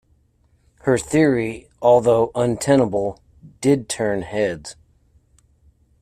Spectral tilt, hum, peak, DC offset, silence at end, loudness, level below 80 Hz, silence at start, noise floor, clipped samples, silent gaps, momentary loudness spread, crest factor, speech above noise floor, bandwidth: -6 dB/octave; none; -2 dBFS; under 0.1%; 1.3 s; -19 LUFS; -50 dBFS; 0.85 s; -60 dBFS; under 0.1%; none; 11 LU; 18 dB; 42 dB; 14.5 kHz